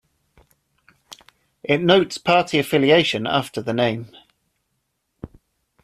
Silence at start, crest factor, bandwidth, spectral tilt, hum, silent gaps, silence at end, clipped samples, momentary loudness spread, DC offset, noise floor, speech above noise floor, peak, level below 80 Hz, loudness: 1.1 s; 20 dB; 14.5 kHz; -5 dB/octave; none; none; 0.55 s; under 0.1%; 26 LU; under 0.1%; -73 dBFS; 55 dB; -2 dBFS; -58 dBFS; -19 LUFS